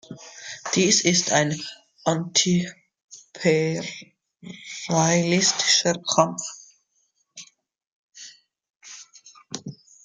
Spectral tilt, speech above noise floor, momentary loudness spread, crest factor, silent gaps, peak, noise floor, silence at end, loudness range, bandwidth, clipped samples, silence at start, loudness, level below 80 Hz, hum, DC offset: -3 dB/octave; 48 dB; 24 LU; 22 dB; 3.04-3.08 s, 7.87-8.09 s, 8.70-8.80 s; -2 dBFS; -70 dBFS; 0.3 s; 12 LU; 10 kHz; under 0.1%; 0.1 s; -21 LUFS; -66 dBFS; none; under 0.1%